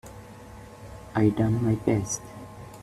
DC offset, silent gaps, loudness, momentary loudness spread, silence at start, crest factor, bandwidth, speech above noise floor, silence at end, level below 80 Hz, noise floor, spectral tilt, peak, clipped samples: under 0.1%; none; -26 LUFS; 22 LU; 0.05 s; 20 dB; 14 kHz; 21 dB; 0 s; -50 dBFS; -45 dBFS; -6.5 dB/octave; -8 dBFS; under 0.1%